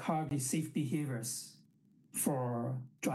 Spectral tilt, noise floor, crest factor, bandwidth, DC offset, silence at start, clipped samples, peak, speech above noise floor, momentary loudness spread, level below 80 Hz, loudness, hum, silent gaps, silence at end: -5 dB/octave; -67 dBFS; 18 dB; 16 kHz; under 0.1%; 0 s; under 0.1%; -18 dBFS; 31 dB; 8 LU; -76 dBFS; -37 LUFS; none; none; 0 s